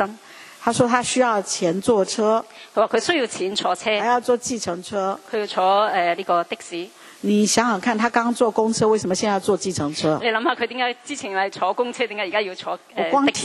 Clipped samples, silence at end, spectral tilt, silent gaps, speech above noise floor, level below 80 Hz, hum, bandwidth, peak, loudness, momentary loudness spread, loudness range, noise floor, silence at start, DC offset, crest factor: under 0.1%; 0 s; -3.5 dB/octave; none; 22 dB; -62 dBFS; none; 13 kHz; -2 dBFS; -21 LUFS; 9 LU; 2 LU; -43 dBFS; 0 s; under 0.1%; 20 dB